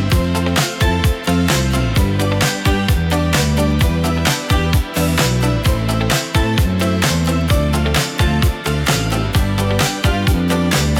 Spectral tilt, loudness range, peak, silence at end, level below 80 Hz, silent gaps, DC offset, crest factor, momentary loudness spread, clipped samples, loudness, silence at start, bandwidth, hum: -5 dB/octave; 0 LU; 0 dBFS; 0 s; -22 dBFS; none; under 0.1%; 14 dB; 2 LU; under 0.1%; -16 LUFS; 0 s; 18 kHz; none